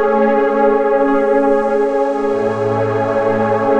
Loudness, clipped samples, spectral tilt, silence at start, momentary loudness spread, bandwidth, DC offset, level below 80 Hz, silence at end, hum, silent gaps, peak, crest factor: -15 LUFS; under 0.1%; -8 dB/octave; 0 s; 3 LU; 8.4 kHz; 1%; -44 dBFS; 0 s; none; none; -2 dBFS; 12 dB